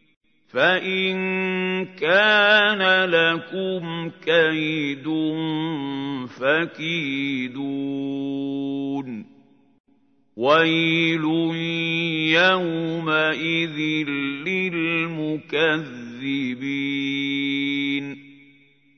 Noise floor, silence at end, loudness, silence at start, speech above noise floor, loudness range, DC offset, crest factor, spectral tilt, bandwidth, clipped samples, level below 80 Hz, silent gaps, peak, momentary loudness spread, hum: -62 dBFS; 0.65 s; -21 LUFS; 0.55 s; 40 dB; 7 LU; under 0.1%; 20 dB; -6 dB/octave; 6.6 kHz; under 0.1%; -76 dBFS; 9.80-9.84 s; -4 dBFS; 11 LU; none